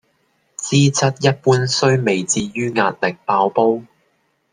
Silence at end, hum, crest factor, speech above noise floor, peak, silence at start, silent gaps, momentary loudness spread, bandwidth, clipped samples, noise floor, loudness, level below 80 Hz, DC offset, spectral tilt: 0.7 s; none; 16 dB; 48 dB; -2 dBFS; 0.6 s; none; 6 LU; 10 kHz; under 0.1%; -64 dBFS; -17 LUFS; -56 dBFS; under 0.1%; -4.5 dB/octave